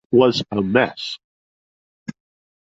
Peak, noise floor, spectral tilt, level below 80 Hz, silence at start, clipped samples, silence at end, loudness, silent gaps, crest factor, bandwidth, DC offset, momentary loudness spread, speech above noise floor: -2 dBFS; under -90 dBFS; -6 dB/octave; -56 dBFS; 0.1 s; under 0.1%; 0.6 s; -19 LUFS; 1.24-2.06 s; 20 dB; 7.8 kHz; under 0.1%; 21 LU; over 72 dB